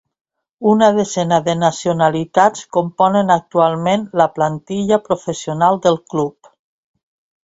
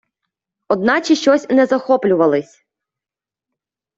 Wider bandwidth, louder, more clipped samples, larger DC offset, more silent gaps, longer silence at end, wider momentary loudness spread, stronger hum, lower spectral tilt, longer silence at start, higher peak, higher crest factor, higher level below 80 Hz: about the same, 8 kHz vs 7.8 kHz; about the same, -16 LUFS vs -15 LUFS; neither; neither; neither; second, 1.15 s vs 1.55 s; first, 8 LU vs 5 LU; neither; about the same, -5.5 dB/octave vs -5 dB/octave; about the same, 0.6 s vs 0.7 s; about the same, 0 dBFS vs -2 dBFS; about the same, 16 dB vs 16 dB; first, -56 dBFS vs -62 dBFS